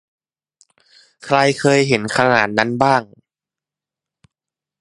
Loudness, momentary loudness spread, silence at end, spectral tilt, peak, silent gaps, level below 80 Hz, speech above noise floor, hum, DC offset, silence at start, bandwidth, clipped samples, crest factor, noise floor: -16 LUFS; 4 LU; 1.75 s; -5 dB/octave; 0 dBFS; none; -58 dBFS; 73 dB; none; under 0.1%; 1.25 s; 11.5 kHz; under 0.1%; 20 dB; -88 dBFS